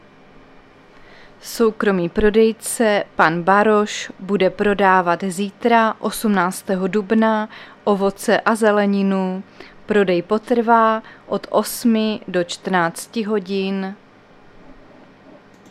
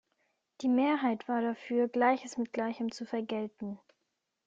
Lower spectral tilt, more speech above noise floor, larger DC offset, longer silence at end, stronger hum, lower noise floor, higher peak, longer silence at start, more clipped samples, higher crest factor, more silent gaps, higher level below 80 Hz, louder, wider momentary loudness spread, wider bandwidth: about the same, -5 dB/octave vs -5.5 dB/octave; second, 29 dB vs 52 dB; neither; first, 1 s vs 0.7 s; neither; second, -47 dBFS vs -83 dBFS; first, 0 dBFS vs -14 dBFS; first, 1.45 s vs 0.6 s; neither; about the same, 18 dB vs 18 dB; neither; first, -46 dBFS vs -78 dBFS; first, -18 LUFS vs -32 LUFS; about the same, 10 LU vs 11 LU; first, 15 kHz vs 7.8 kHz